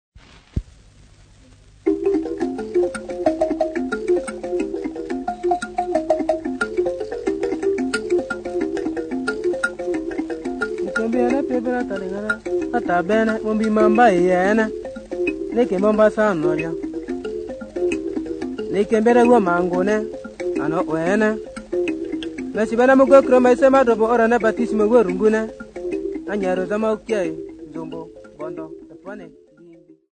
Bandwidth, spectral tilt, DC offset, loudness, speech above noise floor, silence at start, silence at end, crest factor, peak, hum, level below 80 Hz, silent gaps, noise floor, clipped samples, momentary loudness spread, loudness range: 9.6 kHz; -6 dB/octave; under 0.1%; -20 LUFS; 32 dB; 0.15 s; 0.4 s; 20 dB; 0 dBFS; none; -48 dBFS; none; -48 dBFS; under 0.1%; 16 LU; 8 LU